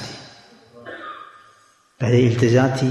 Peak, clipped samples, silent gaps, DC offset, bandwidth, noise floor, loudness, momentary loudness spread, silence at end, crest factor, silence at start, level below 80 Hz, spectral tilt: -6 dBFS; under 0.1%; none; under 0.1%; 11.5 kHz; -55 dBFS; -17 LUFS; 23 LU; 0 s; 16 dB; 0 s; -56 dBFS; -7 dB/octave